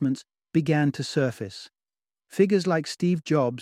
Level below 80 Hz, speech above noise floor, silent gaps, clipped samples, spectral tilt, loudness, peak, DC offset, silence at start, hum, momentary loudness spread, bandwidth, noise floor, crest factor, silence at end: -68 dBFS; over 66 dB; none; under 0.1%; -6.5 dB/octave; -25 LUFS; -8 dBFS; under 0.1%; 0 s; none; 14 LU; 14.5 kHz; under -90 dBFS; 18 dB; 0 s